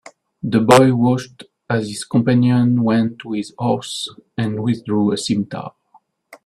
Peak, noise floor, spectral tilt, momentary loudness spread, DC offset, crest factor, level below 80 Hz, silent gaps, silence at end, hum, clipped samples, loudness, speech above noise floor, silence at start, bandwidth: 0 dBFS; -55 dBFS; -6 dB/octave; 15 LU; under 0.1%; 18 dB; -56 dBFS; none; 0.75 s; none; under 0.1%; -18 LUFS; 38 dB; 0.45 s; 13.5 kHz